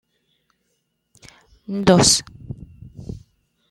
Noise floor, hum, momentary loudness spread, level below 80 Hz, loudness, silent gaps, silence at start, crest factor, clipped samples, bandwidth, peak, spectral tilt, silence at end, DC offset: -71 dBFS; none; 26 LU; -46 dBFS; -16 LUFS; none; 1.7 s; 22 dB; under 0.1%; 13.5 kHz; -2 dBFS; -3.5 dB/octave; 0.55 s; under 0.1%